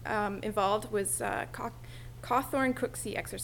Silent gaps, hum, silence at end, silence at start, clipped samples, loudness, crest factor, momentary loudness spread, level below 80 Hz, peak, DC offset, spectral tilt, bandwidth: none; none; 0 s; 0 s; under 0.1%; -32 LUFS; 18 dB; 11 LU; -52 dBFS; -14 dBFS; under 0.1%; -4 dB/octave; 18 kHz